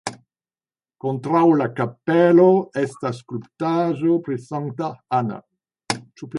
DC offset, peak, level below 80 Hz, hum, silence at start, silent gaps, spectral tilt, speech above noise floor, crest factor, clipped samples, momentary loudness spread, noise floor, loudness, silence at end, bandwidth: under 0.1%; -2 dBFS; -66 dBFS; none; 0.05 s; none; -7 dB/octave; over 71 dB; 18 dB; under 0.1%; 15 LU; under -90 dBFS; -20 LUFS; 0 s; 11.5 kHz